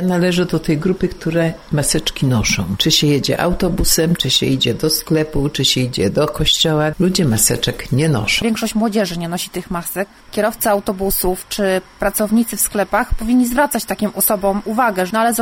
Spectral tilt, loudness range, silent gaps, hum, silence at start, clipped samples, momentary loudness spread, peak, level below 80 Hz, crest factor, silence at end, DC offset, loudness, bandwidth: -4 dB/octave; 3 LU; none; none; 0 s; under 0.1%; 6 LU; 0 dBFS; -32 dBFS; 16 dB; 0 s; under 0.1%; -16 LUFS; 16.5 kHz